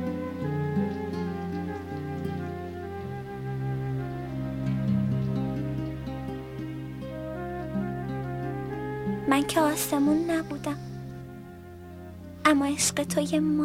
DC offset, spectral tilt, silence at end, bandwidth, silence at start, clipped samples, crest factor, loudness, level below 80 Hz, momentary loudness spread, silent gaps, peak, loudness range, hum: under 0.1%; -5.5 dB/octave; 0 s; 16.5 kHz; 0 s; under 0.1%; 20 dB; -29 LUFS; -50 dBFS; 13 LU; none; -8 dBFS; 6 LU; none